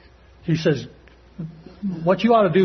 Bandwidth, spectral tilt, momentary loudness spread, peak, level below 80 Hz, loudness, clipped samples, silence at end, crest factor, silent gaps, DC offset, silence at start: 6.4 kHz; -7.5 dB/octave; 20 LU; -4 dBFS; -52 dBFS; -21 LUFS; under 0.1%; 0 s; 16 dB; none; under 0.1%; 0.45 s